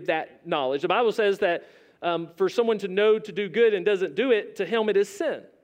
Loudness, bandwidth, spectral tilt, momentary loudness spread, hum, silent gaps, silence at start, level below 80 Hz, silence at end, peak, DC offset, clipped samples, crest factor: -25 LUFS; 15 kHz; -5 dB/octave; 7 LU; none; none; 0 s; -78 dBFS; 0.2 s; -10 dBFS; under 0.1%; under 0.1%; 14 dB